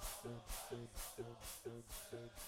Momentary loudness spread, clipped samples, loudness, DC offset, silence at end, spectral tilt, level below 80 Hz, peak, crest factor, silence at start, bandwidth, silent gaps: 3 LU; under 0.1%; -51 LUFS; under 0.1%; 0 s; -3.5 dB/octave; -58 dBFS; -34 dBFS; 16 dB; 0 s; 17.5 kHz; none